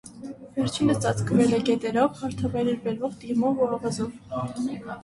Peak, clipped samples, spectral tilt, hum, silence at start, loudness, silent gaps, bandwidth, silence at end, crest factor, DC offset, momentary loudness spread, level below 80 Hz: -8 dBFS; under 0.1%; -6 dB/octave; none; 0.05 s; -26 LUFS; none; 11.5 kHz; 0 s; 16 dB; under 0.1%; 10 LU; -54 dBFS